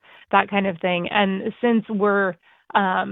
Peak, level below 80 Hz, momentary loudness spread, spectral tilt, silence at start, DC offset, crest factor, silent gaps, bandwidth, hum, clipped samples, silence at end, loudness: 0 dBFS; -64 dBFS; 4 LU; -9.5 dB/octave; 0.3 s; under 0.1%; 22 dB; none; 4 kHz; none; under 0.1%; 0 s; -21 LUFS